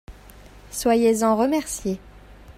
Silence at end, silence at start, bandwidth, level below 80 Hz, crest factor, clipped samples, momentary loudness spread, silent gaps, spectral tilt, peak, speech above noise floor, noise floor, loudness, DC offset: 0.05 s; 0.1 s; 16 kHz; -46 dBFS; 16 dB; under 0.1%; 13 LU; none; -4.5 dB/octave; -8 dBFS; 25 dB; -46 dBFS; -21 LUFS; under 0.1%